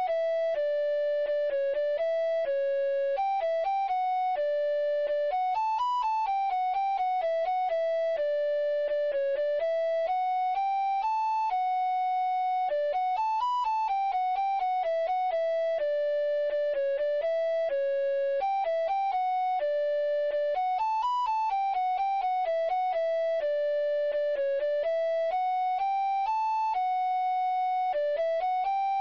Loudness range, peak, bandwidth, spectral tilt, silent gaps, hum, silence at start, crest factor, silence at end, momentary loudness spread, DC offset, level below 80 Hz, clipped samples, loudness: 0 LU; -22 dBFS; 7.4 kHz; -1.5 dB/octave; none; none; 0 s; 6 dB; 0 s; 0 LU; 0.1%; -68 dBFS; under 0.1%; -28 LUFS